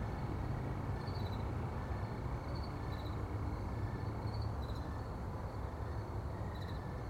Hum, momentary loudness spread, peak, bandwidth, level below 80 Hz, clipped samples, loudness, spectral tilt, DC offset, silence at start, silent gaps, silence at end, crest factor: none; 3 LU; -28 dBFS; 15.5 kHz; -46 dBFS; under 0.1%; -42 LUFS; -7.5 dB/octave; under 0.1%; 0 s; none; 0 s; 12 dB